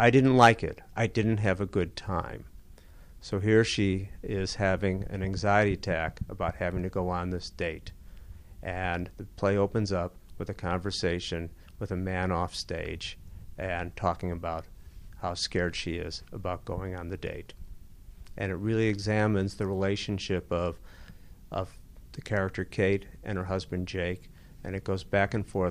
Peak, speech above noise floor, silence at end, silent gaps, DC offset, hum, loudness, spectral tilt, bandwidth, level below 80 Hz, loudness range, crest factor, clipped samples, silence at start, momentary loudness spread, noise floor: -6 dBFS; 21 dB; 0 s; none; under 0.1%; none; -30 LUFS; -6 dB/octave; 14.5 kHz; -46 dBFS; 6 LU; 24 dB; under 0.1%; 0 s; 14 LU; -50 dBFS